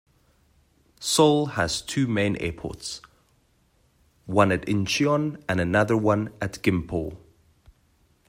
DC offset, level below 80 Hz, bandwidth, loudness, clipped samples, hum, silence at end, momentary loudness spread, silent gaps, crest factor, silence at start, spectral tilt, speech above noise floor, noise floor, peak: under 0.1%; -52 dBFS; 16 kHz; -24 LUFS; under 0.1%; none; 1.1 s; 13 LU; none; 22 dB; 1 s; -5 dB/octave; 41 dB; -64 dBFS; -4 dBFS